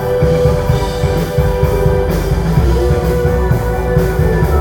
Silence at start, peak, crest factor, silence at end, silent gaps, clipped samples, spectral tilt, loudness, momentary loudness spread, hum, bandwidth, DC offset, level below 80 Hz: 0 s; 0 dBFS; 12 dB; 0 s; none; under 0.1%; -7.5 dB/octave; -14 LUFS; 2 LU; none; 19 kHz; under 0.1%; -18 dBFS